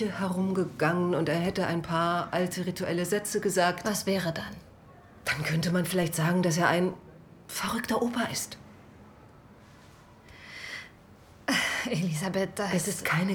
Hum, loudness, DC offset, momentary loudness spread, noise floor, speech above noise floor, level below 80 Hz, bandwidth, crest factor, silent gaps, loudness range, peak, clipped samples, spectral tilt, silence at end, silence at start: none; -29 LUFS; under 0.1%; 13 LU; -53 dBFS; 25 dB; -60 dBFS; 20 kHz; 20 dB; none; 7 LU; -10 dBFS; under 0.1%; -4.5 dB/octave; 0 s; 0 s